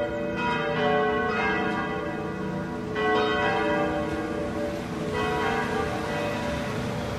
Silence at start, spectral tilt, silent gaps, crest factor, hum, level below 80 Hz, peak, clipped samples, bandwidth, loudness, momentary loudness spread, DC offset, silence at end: 0 s; -5.5 dB/octave; none; 14 dB; none; -46 dBFS; -12 dBFS; under 0.1%; 15 kHz; -27 LUFS; 7 LU; under 0.1%; 0 s